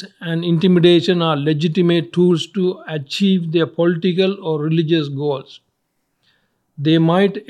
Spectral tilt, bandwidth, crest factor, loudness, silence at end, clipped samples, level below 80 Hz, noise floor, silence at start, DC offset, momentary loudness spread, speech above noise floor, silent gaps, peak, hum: -7.5 dB/octave; 9.8 kHz; 16 dB; -17 LUFS; 0.05 s; under 0.1%; -68 dBFS; -70 dBFS; 0 s; under 0.1%; 10 LU; 54 dB; none; 0 dBFS; none